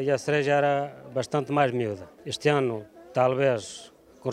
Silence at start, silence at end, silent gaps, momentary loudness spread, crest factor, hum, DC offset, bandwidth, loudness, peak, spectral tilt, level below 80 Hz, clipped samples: 0 s; 0 s; none; 13 LU; 18 dB; none; under 0.1%; 13 kHz; -26 LUFS; -8 dBFS; -5.5 dB/octave; -68 dBFS; under 0.1%